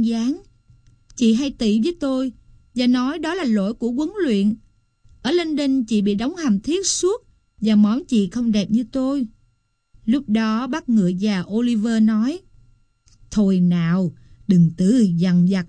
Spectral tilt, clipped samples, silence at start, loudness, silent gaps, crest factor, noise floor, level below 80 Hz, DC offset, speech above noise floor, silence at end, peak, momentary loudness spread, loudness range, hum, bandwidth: -6 dB/octave; under 0.1%; 0 s; -20 LUFS; none; 14 dB; -65 dBFS; -50 dBFS; under 0.1%; 46 dB; 0 s; -6 dBFS; 9 LU; 2 LU; none; 10 kHz